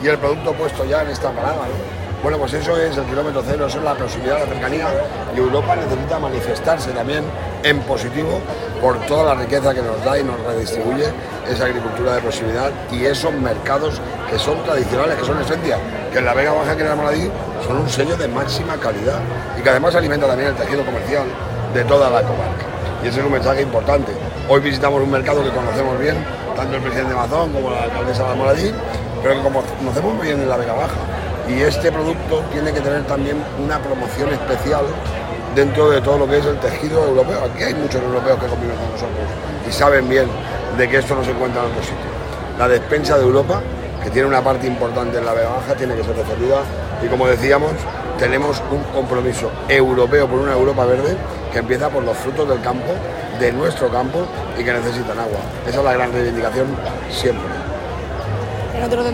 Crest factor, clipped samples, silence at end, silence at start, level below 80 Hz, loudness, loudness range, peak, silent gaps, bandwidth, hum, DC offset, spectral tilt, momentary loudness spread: 18 dB; under 0.1%; 0 s; 0 s; -34 dBFS; -18 LUFS; 3 LU; 0 dBFS; none; 16.5 kHz; none; under 0.1%; -6 dB/octave; 8 LU